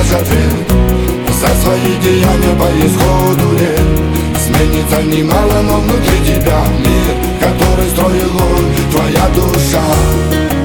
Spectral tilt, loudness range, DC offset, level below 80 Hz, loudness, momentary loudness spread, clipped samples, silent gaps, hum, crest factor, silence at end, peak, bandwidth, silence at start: -5.5 dB/octave; 1 LU; 0.1%; -16 dBFS; -11 LUFS; 2 LU; under 0.1%; none; none; 10 dB; 0 s; 0 dBFS; over 20 kHz; 0 s